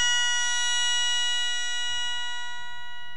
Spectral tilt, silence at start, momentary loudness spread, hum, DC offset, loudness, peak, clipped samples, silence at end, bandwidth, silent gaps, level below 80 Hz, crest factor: 3.5 dB/octave; 0 s; 14 LU; none; 4%; -25 LUFS; -14 dBFS; under 0.1%; 0 s; 14 kHz; none; -66 dBFS; 14 dB